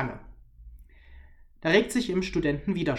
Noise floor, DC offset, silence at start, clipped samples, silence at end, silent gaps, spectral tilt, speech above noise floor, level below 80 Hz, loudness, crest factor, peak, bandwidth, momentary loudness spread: -50 dBFS; under 0.1%; 0 s; under 0.1%; 0 s; none; -5.5 dB/octave; 25 dB; -48 dBFS; -26 LUFS; 22 dB; -8 dBFS; 16 kHz; 11 LU